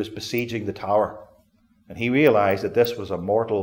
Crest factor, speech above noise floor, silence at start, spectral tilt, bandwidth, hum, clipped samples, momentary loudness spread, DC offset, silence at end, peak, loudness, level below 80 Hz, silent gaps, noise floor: 18 dB; 38 dB; 0 s; -6 dB/octave; 17 kHz; none; under 0.1%; 11 LU; under 0.1%; 0 s; -4 dBFS; -22 LUFS; -58 dBFS; none; -60 dBFS